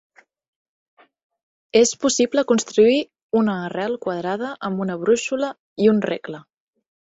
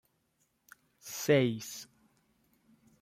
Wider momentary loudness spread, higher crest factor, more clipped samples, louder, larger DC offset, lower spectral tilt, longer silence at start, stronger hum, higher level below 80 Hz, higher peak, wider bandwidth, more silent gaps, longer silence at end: second, 10 LU vs 23 LU; about the same, 18 dB vs 22 dB; neither; first, -20 LUFS vs -31 LUFS; neither; about the same, -4 dB/octave vs -5 dB/octave; first, 1.75 s vs 1.05 s; neither; first, -64 dBFS vs -78 dBFS; first, -4 dBFS vs -14 dBFS; second, 8.2 kHz vs 16 kHz; first, 3.23-3.29 s, 5.59-5.76 s vs none; second, 0.7 s vs 1.15 s